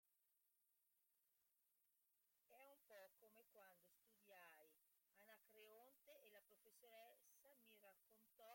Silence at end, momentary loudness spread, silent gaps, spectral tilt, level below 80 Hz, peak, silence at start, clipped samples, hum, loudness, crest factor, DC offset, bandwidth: 0 s; 1 LU; none; -1.5 dB/octave; under -90 dBFS; -54 dBFS; 0.05 s; under 0.1%; none; -68 LUFS; 20 dB; under 0.1%; 16.5 kHz